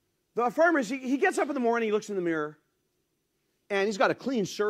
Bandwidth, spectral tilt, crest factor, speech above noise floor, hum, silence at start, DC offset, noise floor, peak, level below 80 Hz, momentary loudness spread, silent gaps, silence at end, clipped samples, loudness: 15 kHz; -4.5 dB/octave; 18 dB; 50 dB; none; 0.35 s; under 0.1%; -77 dBFS; -10 dBFS; -78 dBFS; 8 LU; none; 0 s; under 0.1%; -27 LUFS